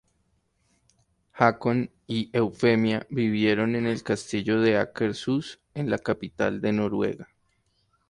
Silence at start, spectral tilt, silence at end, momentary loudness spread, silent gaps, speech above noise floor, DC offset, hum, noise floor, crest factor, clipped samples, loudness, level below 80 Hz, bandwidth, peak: 1.35 s; -6.5 dB/octave; 0.85 s; 8 LU; none; 45 dB; under 0.1%; none; -70 dBFS; 22 dB; under 0.1%; -26 LUFS; -60 dBFS; 11 kHz; -4 dBFS